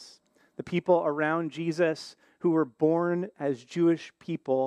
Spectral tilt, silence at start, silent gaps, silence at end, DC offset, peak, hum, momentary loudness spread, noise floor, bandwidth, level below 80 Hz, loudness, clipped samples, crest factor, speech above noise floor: -7 dB/octave; 0 s; none; 0 s; under 0.1%; -10 dBFS; none; 12 LU; -59 dBFS; 10 kHz; -76 dBFS; -28 LUFS; under 0.1%; 18 dB; 31 dB